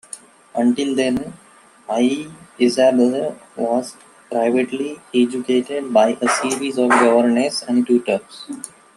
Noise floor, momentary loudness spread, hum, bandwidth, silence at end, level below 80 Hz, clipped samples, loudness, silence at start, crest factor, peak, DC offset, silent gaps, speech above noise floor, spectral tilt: -40 dBFS; 17 LU; none; 12.5 kHz; 0.3 s; -62 dBFS; under 0.1%; -18 LUFS; 0.15 s; 18 dB; 0 dBFS; under 0.1%; none; 22 dB; -4 dB/octave